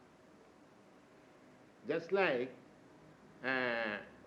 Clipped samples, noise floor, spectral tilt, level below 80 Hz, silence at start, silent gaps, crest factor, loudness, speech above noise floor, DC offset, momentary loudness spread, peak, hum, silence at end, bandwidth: under 0.1%; -62 dBFS; -6 dB/octave; -80 dBFS; 1.8 s; none; 24 dB; -37 LUFS; 26 dB; under 0.1%; 14 LU; -18 dBFS; none; 0.1 s; 8.8 kHz